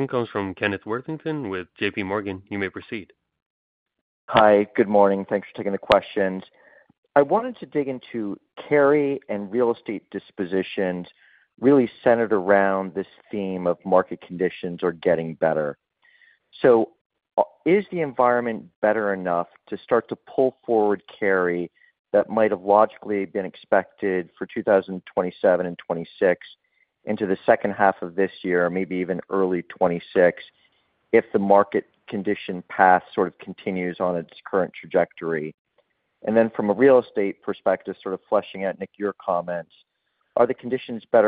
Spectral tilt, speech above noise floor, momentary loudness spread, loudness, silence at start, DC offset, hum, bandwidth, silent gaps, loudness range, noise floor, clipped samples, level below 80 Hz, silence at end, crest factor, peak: -9 dB/octave; 46 dB; 12 LU; -23 LUFS; 0 s; under 0.1%; none; 4.9 kHz; 3.46-3.86 s, 4.01-4.28 s, 6.98-7.03 s, 17.01-17.10 s, 18.76-18.82 s, 21.99-22.05 s, 35.54-35.65 s; 4 LU; -68 dBFS; under 0.1%; -64 dBFS; 0 s; 22 dB; 0 dBFS